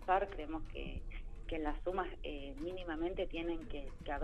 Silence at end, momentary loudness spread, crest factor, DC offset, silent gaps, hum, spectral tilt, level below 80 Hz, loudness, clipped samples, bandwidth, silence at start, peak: 0 s; 9 LU; 20 dB; under 0.1%; none; none; -7 dB/octave; -46 dBFS; -42 LUFS; under 0.1%; 8.2 kHz; 0 s; -20 dBFS